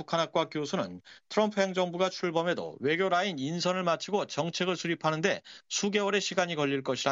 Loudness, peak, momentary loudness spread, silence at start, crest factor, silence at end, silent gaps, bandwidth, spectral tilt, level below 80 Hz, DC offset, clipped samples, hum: -30 LUFS; -12 dBFS; 5 LU; 0 s; 18 dB; 0 s; none; 7.8 kHz; -4 dB/octave; -76 dBFS; under 0.1%; under 0.1%; none